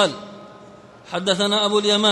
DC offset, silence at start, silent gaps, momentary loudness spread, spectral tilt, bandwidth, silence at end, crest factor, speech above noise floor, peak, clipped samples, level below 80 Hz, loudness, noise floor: under 0.1%; 0 s; none; 21 LU; -3 dB/octave; 11.5 kHz; 0 s; 16 dB; 25 dB; -4 dBFS; under 0.1%; -66 dBFS; -19 LUFS; -44 dBFS